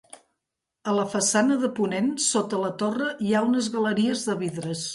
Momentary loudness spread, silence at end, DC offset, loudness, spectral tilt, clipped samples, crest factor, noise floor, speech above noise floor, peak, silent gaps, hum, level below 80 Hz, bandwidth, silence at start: 7 LU; 0 s; under 0.1%; -24 LUFS; -4 dB/octave; under 0.1%; 16 dB; -84 dBFS; 59 dB; -8 dBFS; none; none; -68 dBFS; 11.5 kHz; 0.85 s